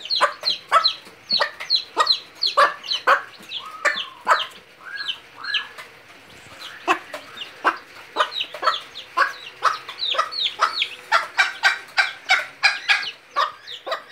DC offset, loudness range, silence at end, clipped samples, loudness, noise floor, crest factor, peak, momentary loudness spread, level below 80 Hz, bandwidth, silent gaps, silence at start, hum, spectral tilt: under 0.1%; 7 LU; 0.05 s; under 0.1%; -21 LUFS; -46 dBFS; 20 dB; -2 dBFS; 14 LU; -74 dBFS; 16 kHz; none; 0 s; none; 0 dB/octave